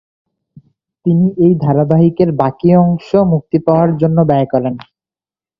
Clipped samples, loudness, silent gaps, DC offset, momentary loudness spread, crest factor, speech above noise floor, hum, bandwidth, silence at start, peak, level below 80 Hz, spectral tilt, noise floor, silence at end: under 0.1%; -12 LUFS; none; under 0.1%; 5 LU; 14 dB; over 79 dB; none; 5.2 kHz; 1.05 s; 0 dBFS; -46 dBFS; -11.5 dB/octave; under -90 dBFS; 0.8 s